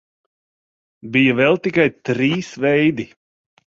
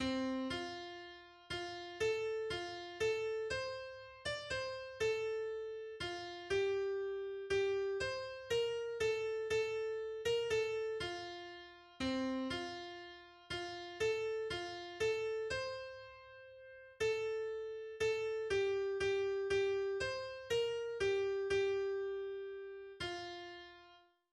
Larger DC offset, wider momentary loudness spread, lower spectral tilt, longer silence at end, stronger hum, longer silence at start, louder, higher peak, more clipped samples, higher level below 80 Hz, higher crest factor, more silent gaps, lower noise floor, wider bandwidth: neither; second, 6 LU vs 13 LU; first, -6.5 dB/octave vs -4 dB/octave; first, 0.75 s vs 0.35 s; neither; first, 1.05 s vs 0 s; first, -17 LUFS vs -39 LUFS; first, -2 dBFS vs -26 dBFS; neither; first, -58 dBFS vs -66 dBFS; about the same, 18 dB vs 14 dB; neither; first, under -90 dBFS vs -65 dBFS; second, 7.6 kHz vs 12.5 kHz